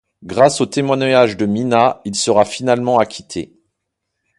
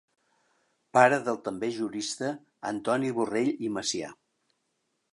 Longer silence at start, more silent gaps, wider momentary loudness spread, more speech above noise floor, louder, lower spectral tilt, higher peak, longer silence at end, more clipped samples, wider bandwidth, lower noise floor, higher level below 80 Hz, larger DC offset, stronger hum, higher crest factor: second, 0.2 s vs 0.95 s; neither; about the same, 13 LU vs 13 LU; first, 61 dB vs 50 dB; first, -15 LUFS vs -28 LUFS; about the same, -4.5 dB/octave vs -4 dB/octave; first, 0 dBFS vs -6 dBFS; about the same, 0.95 s vs 1 s; neither; about the same, 11.5 kHz vs 11.5 kHz; about the same, -76 dBFS vs -78 dBFS; first, -54 dBFS vs -72 dBFS; neither; neither; second, 16 dB vs 22 dB